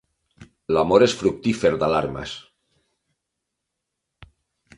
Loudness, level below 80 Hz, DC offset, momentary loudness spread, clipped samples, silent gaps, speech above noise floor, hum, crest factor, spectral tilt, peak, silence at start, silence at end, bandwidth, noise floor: -20 LUFS; -50 dBFS; under 0.1%; 18 LU; under 0.1%; none; 61 dB; none; 22 dB; -5.5 dB/octave; -2 dBFS; 0.4 s; 2.4 s; 11.5 kHz; -81 dBFS